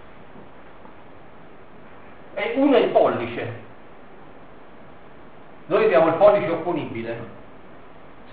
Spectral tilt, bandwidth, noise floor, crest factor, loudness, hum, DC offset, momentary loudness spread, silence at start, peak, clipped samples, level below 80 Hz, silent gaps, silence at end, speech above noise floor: -4.5 dB/octave; 4.7 kHz; -46 dBFS; 22 dB; -20 LUFS; none; 0.8%; 18 LU; 0.4 s; -2 dBFS; under 0.1%; -58 dBFS; none; 0.9 s; 27 dB